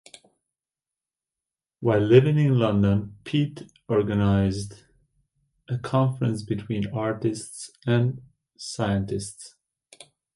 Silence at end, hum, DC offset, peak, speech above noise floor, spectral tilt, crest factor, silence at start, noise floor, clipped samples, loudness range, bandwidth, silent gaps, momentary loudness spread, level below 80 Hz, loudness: 0.9 s; none; under 0.1%; -4 dBFS; over 67 dB; -7 dB/octave; 22 dB; 1.8 s; under -90 dBFS; under 0.1%; 6 LU; 11.5 kHz; none; 18 LU; -48 dBFS; -24 LUFS